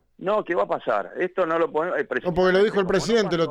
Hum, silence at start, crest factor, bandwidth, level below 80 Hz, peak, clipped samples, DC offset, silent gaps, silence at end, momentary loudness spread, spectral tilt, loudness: none; 0.2 s; 14 dB; 11.5 kHz; -50 dBFS; -8 dBFS; under 0.1%; under 0.1%; none; 0 s; 6 LU; -5.5 dB/octave; -23 LUFS